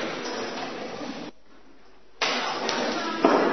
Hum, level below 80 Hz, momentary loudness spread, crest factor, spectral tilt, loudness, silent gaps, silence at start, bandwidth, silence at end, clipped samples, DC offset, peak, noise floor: none; -66 dBFS; 13 LU; 24 dB; -3 dB/octave; -27 LUFS; none; 0 s; 6.4 kHz; 0 s; under 0.1%; 0.5%; -4 dBFS; -56 dBFS